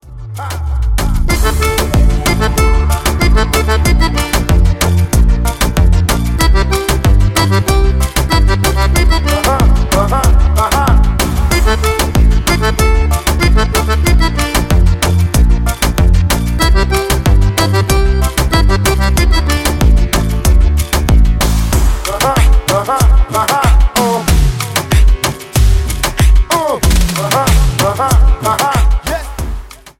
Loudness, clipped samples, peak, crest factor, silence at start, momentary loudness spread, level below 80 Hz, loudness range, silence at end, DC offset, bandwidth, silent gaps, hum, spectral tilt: -12 LUFS; under 0.1%; 0 dBFS; 10 dB; 0.05 s; 3 LU; -12 dBFS; 1 LU; 0.1 s; under 0.1%; 17 kHz; none; none; -4.5 dB/octave